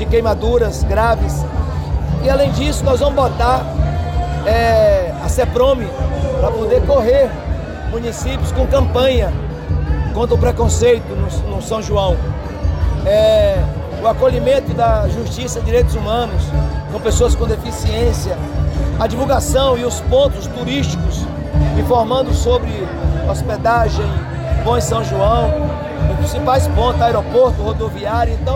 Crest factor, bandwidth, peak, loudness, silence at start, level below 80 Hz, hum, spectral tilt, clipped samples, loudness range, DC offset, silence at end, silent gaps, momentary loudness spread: 12 dB; 16.5 kHz; -4 dBFS; -16 LUFS; 0 s; -22 dBFS; none; -6 dB/octave; under 0.1%; 2 LU; under 0.1%; 0 s; none; 7 LU